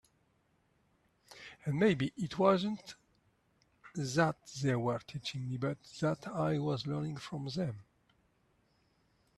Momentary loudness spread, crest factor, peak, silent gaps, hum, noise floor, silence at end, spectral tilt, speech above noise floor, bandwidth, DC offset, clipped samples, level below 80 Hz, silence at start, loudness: 13 LU; 22 dB; -14 dBFS; none; none; -74 dBFS; 1.55 s; -6 dB/octave; 40 dB; 12.5 kHz; under 0.1%; under 0.1%; -70 dBFS; 1.3 s; -35 LUFS